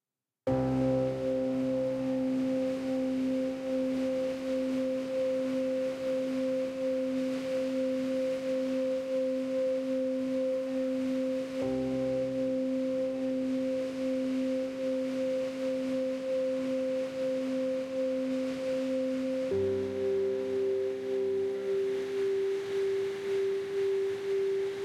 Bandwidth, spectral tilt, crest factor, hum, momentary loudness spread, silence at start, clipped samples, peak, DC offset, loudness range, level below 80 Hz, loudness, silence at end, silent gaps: 12.5 kHz; -6.5 dB/octave; 12 dB; none; 2 LU; 0.45 s; under 0.1%; -18 dBFS; under 0.1%; 1 LU; -64 dBFS; -32 LUFS; 0 s; none